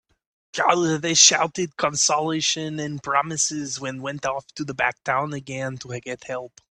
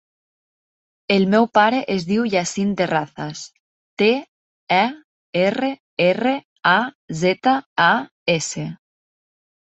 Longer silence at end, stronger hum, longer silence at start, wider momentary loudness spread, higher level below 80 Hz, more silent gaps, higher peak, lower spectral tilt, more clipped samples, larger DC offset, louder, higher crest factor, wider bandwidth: second, 0.35 s vs 0.9 s; neither; second, 0.55 s vs 1.1 s; first, 17 LU vs 13 LU; about the same, -62 dBFS vs -62 dBFS; second, none vs 3.60-3.97 s, 4.28-4.67 s, 5.04-5.33 s, 5.80-5.97 s, 6.45-6.56 s, 6.95-7.08 s, 7.66-7.76 s, 8.11-8.26 s; about the same, 0 dBFS vs -2 dBFS; second, -2 dB/octave vs -4.5 dB/octave; neither; neither; second, -22 LUFS vs -19 LUFS; about the same, 24 dB vs 20 dB; first, 11.5 kHz vs 8.4 kHz